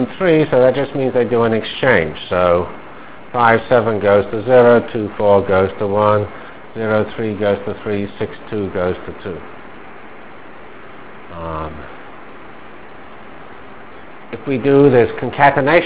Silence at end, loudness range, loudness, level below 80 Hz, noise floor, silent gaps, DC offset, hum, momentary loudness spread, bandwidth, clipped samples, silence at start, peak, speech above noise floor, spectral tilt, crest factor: 0 s; 18 LU; -15 LUFS; -42 dBFS; -37 dBFS; none; 2%; none; 25 LU; 4 kHz; under 0.1%; 0 s; 0 dBFS; 23 dB; -10.5 dB/octave; 16 dB